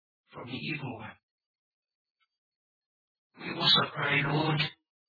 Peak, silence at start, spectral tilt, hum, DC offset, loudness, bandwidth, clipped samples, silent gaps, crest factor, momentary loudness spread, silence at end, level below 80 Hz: -10 dBFS; 0.35 s; -6 dB/octave; none; under 0.1%; -27 LUFS; 5 kHz; under 0.1%; 1.23-1.38 s, 1.46-1.83 s, 1.95-2.05 s, 2.11-2.15 s, 2.38-3.30 s; 22 dB; 21 LU; 0.35 s; -68 dBFS